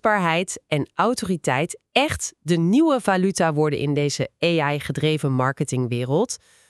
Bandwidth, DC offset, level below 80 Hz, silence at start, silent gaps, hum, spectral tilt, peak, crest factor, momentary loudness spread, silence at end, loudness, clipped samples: 13 kHz; under 0.1%; -54 dBFS; 0.05 s; none; none; -5 dB/octave; -4 dBFS; 18 dB; 5 LU; 0.35 s; -22 LUFS; under 0.1%